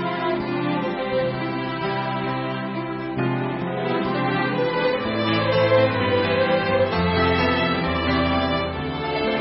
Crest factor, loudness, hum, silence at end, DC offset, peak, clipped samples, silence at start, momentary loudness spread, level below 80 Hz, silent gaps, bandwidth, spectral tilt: 16 dB; -22 LUFS; none; 0 s; under 0.1%; -6 dBFS; under 0.1%; 0 s; 7 LU; -44 dBFS; none; 5.8 kHz; -10.5 dB/octave